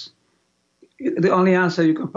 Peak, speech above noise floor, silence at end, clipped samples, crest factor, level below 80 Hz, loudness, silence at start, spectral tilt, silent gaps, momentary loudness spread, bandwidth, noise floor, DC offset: -6 dBFS; 49 dB; 0.05 s; under 0.1%; 14 dB; -68 dBFS; -19 LUFS; 0 s; -7.5 dB/octave; none; 12 LU; 7.6 kHz; -67 dBFS; under 0.1%